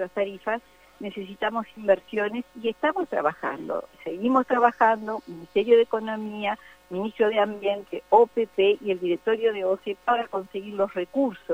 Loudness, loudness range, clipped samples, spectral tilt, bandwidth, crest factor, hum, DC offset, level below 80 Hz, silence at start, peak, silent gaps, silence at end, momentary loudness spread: -25 LUFS; 4 LU; under 0.1%; -6 dB/octave; 16 kHz; 20 dB; none; under 0.1%; -66 dBFS; 0 s; -6 dBFS; none; 0 s; 13 LU